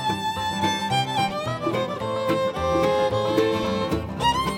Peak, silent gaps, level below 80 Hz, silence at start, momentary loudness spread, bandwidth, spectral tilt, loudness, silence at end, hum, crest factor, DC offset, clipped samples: -8 dBFS; none; -44 dBFS; 0 s; 5 LU; 17 kHz; -5 dB/octave; -24 LUFS; 0 s; none; 16 dB; under 0.1%; under 0.1%